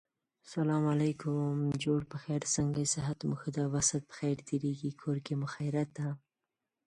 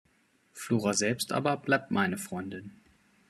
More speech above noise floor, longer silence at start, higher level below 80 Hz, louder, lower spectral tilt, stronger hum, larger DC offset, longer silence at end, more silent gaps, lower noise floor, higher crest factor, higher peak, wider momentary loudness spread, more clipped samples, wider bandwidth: first, 56 dB vs 38 dB; about the same, 0.45 s vs 0.55 s; first, -64 dBFS vs -72 dBFS; second, -34 LUFS vs -29 LUFS; about the same, -5 dB/octave vs -4 dB/octave; neither; neither; about the same, 0.7 s vs 0.6 s; neither; first, -89 dBFS vs -68 dBFS; about the same, 18 dB vs 22 dB; second, -16 dBFS vs -10 dBFS; second, 7 LU vs 14 LU; neither; second, 11.5 kHz vs 13.5 kHz